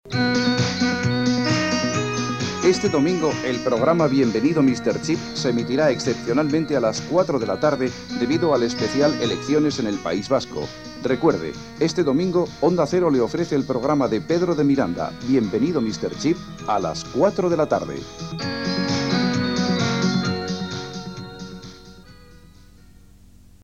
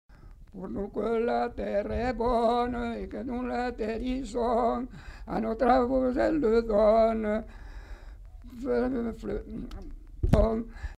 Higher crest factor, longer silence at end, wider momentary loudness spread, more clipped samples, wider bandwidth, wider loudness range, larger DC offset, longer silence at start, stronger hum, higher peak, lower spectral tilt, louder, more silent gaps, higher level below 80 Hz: about the same, 16 dB vs 20 dB; first, 1.25 s vs 0.05 s; second, 8 LU vs 21 LU; neither; second, 9.6 kHz vs 11.5 kHz; second, 3 LU vs 6 LU; first, 0.2% vs under 0.1%; about the same, 0.05 s vs 0.1 s; neither; first, -4 dBFS vs -8 dBFS; second, -5.5 dB/octave vs -7.5 dB/octave; first, -21 LUFS vs -28 LUFS; neither; second, -50 dBFS vs -40 dBFS